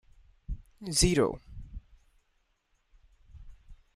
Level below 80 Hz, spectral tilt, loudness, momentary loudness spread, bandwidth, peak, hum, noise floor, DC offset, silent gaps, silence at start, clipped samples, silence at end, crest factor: -44 dBFS; -4 dB/octave; -27 LUFS; 24 LU; 15 kHz; -8 dBFS; none; -73 dBFS; under 0.1%; none; 0.5 s; under 0.1%; 0.2 s; 26 dB